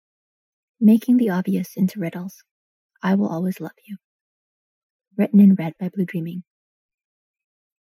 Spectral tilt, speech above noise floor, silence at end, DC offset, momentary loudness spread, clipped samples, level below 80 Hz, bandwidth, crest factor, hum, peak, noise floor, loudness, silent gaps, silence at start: -8.5 dB/octave; over 71 dB; 1.5 s; under 0.1%; 21 LU; under 0.1%; -76 dBFS; 15 kHz; 18 dB; none; -4 dBFS; under -90 dBFS; -20 LUFS; 2.51-2.89 s, 4.04-4.99 s; 0.8 s